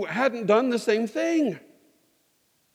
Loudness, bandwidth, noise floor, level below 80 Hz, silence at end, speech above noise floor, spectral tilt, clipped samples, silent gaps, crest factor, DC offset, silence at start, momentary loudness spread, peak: -24 LUFS; 15.5 kHz; -68 dBFS; -82 dBFS; 1.15 s; 44 dB; -5 dB/octave; under 0.1%; none; 20 dB; under 0.1%; 0 s; 6 LU; -6 dBFS